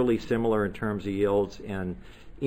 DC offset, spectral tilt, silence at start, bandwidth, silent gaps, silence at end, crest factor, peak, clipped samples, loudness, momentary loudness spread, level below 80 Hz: under 0.1%; -7.5 dB/octave; 0 s; 15.5 kHz; none; 0 s; 14 dB; -14 dBFS; under 0.1%; -28 LUFS; 9 LU; -48 dBFS